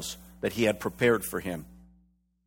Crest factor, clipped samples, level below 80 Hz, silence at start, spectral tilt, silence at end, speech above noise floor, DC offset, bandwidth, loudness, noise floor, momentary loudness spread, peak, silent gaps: 20 dB; under 0.1%; -56 dBFS; 0 s; -4.5 dB/octave; 0.7 s; 39 dB; under 0.1%; 18 kHz; -29 LUFS; -66 dBFS; 13 LU; -10 dBFS; none